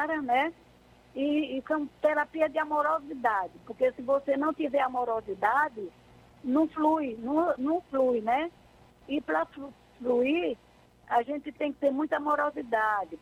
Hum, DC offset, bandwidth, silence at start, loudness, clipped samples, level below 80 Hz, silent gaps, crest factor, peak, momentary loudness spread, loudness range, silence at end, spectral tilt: 60 Hz at -65 dBFS; under 0.1%; 12.5 kHz; 0 s; -29 LUFS; under 0.1%; -64 dBFS; none; 16 dB; -12 dBFS; 9 LU; 2 LU; 0.05 s; -6 dB/octave